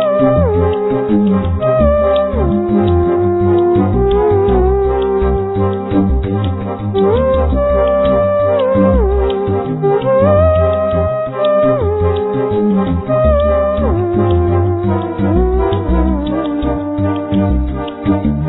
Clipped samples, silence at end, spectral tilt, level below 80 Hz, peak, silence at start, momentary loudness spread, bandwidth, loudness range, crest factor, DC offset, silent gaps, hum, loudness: under 0.1%; 0 s; -12.5 dB/octave; -22 dBFS; -2 dBFS; 0 s; 5 LU; 4.1 kHz; 2 LU; 12 dB; under 0.1%; none; none; -13 LUFS